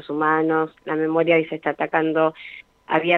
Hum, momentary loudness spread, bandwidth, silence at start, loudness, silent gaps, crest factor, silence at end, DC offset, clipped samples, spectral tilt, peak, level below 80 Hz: none; 11 LU; 4.2 kHz; 0.05 s; -21 LUFS; none; 18 dB; 0 s; under 0.1%; under 0.1%; -8 dB/octave; -2 dBFS; -68 dBFS